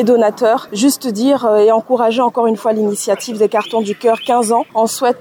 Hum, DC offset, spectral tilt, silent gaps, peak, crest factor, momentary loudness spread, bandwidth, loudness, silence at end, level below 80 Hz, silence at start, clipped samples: none; under 0.1%; -4 dB/octave; none; -2 dBFS; 10 dB; 5 LU; 20 kHz; -14 LUFS; 0.05 s; -70 dBFS; 0 s; under 0.1%